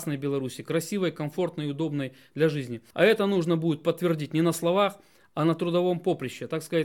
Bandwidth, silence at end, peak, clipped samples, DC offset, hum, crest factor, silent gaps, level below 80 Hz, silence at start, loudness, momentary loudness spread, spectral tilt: 17.5 kHz; 0 s; -8 dBFS; under 0.1%; under 0.1%; none; 18 dB; none; -72 dBFS; 0 s; -27 LUFS; 9 LU; -6 dB/octave